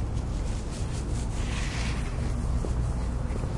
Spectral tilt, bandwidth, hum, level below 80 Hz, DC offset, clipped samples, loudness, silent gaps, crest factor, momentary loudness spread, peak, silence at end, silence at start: -6 dB/octave; 11.5 kHz; none; -30 dBFS; under 0.1%; under 0.1%; -31 LUFS; none; 12 dB; 3 LU; -16 dBFS; 0 s; 0 s